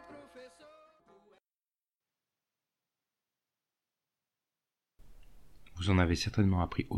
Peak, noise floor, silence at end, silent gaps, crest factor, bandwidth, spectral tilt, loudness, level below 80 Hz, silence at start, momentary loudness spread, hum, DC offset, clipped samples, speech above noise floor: -16 dBFS; under -90 dBFS; 0 s; none; 22 dB; 12.5 kHz; -6 dB/octave; -31 LUFS; -52 dBFS; 0.1 s; 25 LU; none; under 0.1%; under 0.1%; over 61 dB